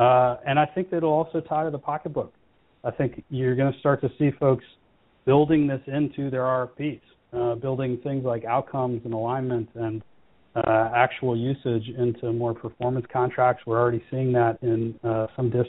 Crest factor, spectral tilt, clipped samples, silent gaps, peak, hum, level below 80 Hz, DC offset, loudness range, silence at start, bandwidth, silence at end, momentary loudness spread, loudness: 20 dB; -6.5 dB/octave; under 0.1%; none; -4 dBFS; none; -56 dBFS; under 0.1%; 4 LU; 0 s; 4 kHz; 0 s; 9 LU; -25 LUFS